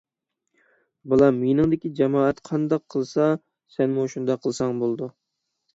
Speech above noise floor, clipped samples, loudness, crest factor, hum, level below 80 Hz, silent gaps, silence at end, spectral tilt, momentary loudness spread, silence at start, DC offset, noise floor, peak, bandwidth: 57 dB; under 0.1%; -23 LUFS; 20 dB; none; -56 dBFS; none; 0.65 s; -7.5 dB/octave; 8 LU; 1.05 s; under 0.1%; -79 dBFS; -4 dBFS; 8 kHz